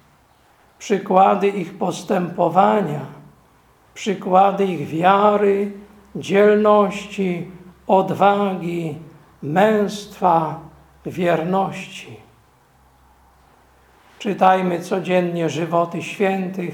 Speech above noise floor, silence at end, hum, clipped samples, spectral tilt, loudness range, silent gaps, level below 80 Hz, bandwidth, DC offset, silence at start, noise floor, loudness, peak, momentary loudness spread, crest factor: 37 dB; 0 s; none; under 0.1%; -6.5 dB/octave; 7 LU; none; -60 dBFS; 16.5 kHz; under 0.1%; 0.8 s; -55 dBFS; -19 LUFS; 0 dBFS; 17 LU; 20 dB